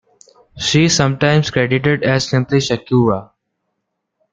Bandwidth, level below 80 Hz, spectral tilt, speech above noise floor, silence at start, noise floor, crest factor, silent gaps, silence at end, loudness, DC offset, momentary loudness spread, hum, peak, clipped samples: 9.2 kHz; -48 dBFS; -5 dB/octave; 59 dB; 0.55 s; -74 dBFS; 16 dB; none; 1.1 s; -15 LUFS; under 0.1%; 4 LU; none; 0 dBFS; under 0.1%